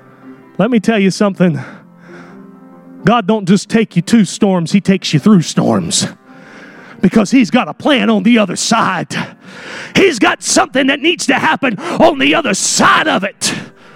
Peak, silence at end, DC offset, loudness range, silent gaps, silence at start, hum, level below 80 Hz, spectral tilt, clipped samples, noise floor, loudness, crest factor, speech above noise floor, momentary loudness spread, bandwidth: 0 dBFS; 0.25 s; under 0.1%; 4 LU; none; 0.25 s; none; -50 dBFS; -4.5 dB/octave; under 0.1%; -37 dBFS; -12 LUFS; 14 dB; 25 dB; 8 LU; 15.5 kHz